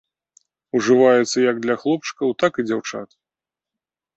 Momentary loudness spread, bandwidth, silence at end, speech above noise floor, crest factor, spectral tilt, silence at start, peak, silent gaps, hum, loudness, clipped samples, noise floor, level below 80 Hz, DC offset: 11 LU; 8.2 kHz; 1.1 s; 70 dB; 18 dB; -4.5 dB/octave; 0.75 s; -2 dBFS; none; none; -19 LUFS; under 0.1%; -89 dBFS; -68 dBFS; under 0.1%